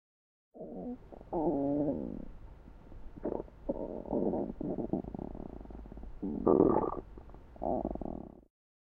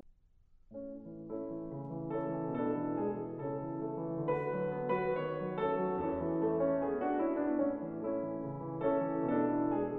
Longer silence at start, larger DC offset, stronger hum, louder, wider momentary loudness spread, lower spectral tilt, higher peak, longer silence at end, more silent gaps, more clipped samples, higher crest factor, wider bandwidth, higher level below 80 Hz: first, 0.55 s vs 0.05 s; neither; neither; about the same, -35 LUFS vs -35 LUFS; first, 24 LU vs 10 LU; first, -12 dB/octave vs -8 dB/octave; first, -10 dBFS vs -20 dBFS; first, 0.55 s vs 0 s; neither; neither; first, 24 dB vs 14 dB; second, 3.7 kHz vs 4.3 kHz; first, -50 dBFS vs -64 dBFS